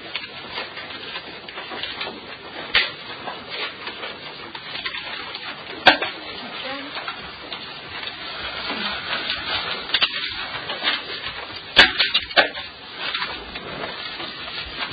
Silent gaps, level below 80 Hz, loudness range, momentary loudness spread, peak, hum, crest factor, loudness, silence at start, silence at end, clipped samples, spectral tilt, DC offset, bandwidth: none; -52 dBFS; 7 LU; 15 LU; 0 dBFS; none; 26 dB; -23 LUFS; 0 s; 0 s; under 0.1%; -3 dB/octave; under 0.1%; 8 kHz